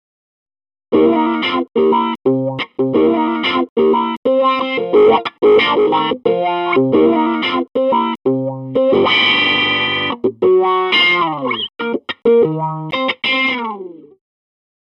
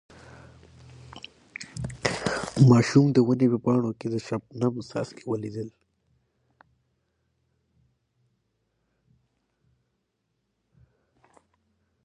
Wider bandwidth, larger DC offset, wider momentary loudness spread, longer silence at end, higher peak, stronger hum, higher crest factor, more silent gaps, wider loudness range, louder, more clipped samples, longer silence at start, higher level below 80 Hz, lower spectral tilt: second, 6.2 kHz vs 11 kHz; neither; second, 9 LU vs 23 LU; second, 0.9 s vs 6.35 s; first, 0 dBFS vs -4 dBFS; neither; second, 14 dB vs 24 dB; first, 3.69-3.76 s, 4.17-4.23 s vs none; second, 3 LU vs 16 LU; first, -14 LUFS vs -24 LUFS; neither; second, 0.9 s vs 1.15 s; about the same, -58 dBFS vs -58 dBFS; about the same, -6.5 dB/octave vs -7 dB/octave